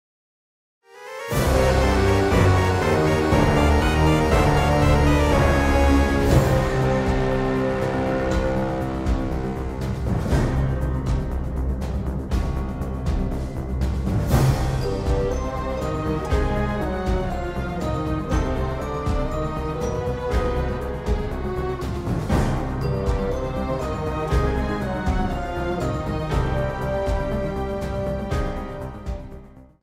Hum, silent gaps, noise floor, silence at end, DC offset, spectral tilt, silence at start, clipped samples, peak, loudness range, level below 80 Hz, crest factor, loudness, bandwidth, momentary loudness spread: none; none; -42 dBFS; 0.2 s; under 0.1%; -6.5 dB/octave; 0.95 s; under 0.1%; -4 dBFS; 7 LU; -26 dBFS; 16 dB; -23 LUFS; 16 kHz; 9 LU